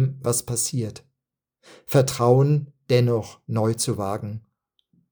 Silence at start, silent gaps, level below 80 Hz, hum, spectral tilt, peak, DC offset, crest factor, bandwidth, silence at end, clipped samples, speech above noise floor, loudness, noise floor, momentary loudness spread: 0 s; none; -60 dBFS; none; -5.5 dB/octave; -4 dBFS; under 0.1%; 20 dB; over 20 kHz; 0.7 s; under 0.1%; 63 dB; -23 LUFS; -85 dBFS; 13 LU